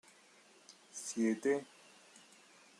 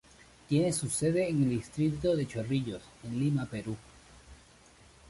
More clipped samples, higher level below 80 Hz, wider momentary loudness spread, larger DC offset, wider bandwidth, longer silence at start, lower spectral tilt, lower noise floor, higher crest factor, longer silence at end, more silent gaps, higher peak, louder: neither; second, under -90 dBFS vs -58 dBFS; first, 26 LU vs 11 LU; neither; first, 13 kHz vs 11.5 kHz; first, 0.95 s vs 0.5 s; second, -4 dB/octave vs -6 dB/octave; first, -64 dBFS vs -58 dBFS; about the same, 20 dB vs 16 dB; second, 0.6 s vs 0.75 s; neither; second, -22 dBFS vs -16 dBFS; second, -37 LUFS vs -31 LUFS